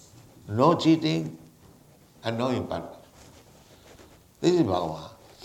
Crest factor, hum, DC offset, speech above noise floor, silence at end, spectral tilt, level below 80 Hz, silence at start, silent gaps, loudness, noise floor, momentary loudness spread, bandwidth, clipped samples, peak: 22 dB; none; under 0.1%; 31 dB; 0.3 s; -6.5 dB/octave; -60 dBFS; 0.45 s; none; -25 LUFS; -55 dBFS; 17 LU; 14 kHz; under 0.1%; -6 dBFS